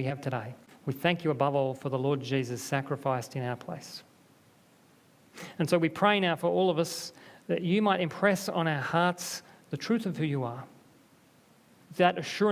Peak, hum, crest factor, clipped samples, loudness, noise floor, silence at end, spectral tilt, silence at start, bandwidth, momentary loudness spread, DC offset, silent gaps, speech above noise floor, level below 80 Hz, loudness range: -8 dBFS; none; 22 dB; under 0.1%; -29 LUFS; -61 dBFS; 0 s; -5.5 dB/octave; 0 s; 16 kHz; 15 LU; under 0.1%; none; 32 dB; -72 dBFS; 6 LU